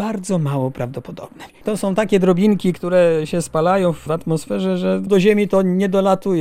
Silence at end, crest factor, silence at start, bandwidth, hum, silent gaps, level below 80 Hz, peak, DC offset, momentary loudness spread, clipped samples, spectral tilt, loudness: 0 s; 16 dB; 0 s; 15 kHz; none; none; -48 dBFS; -2 dBFS; under 0.1%; 12 LU; under 0.1%; -7 dB/octave; -18 LUFS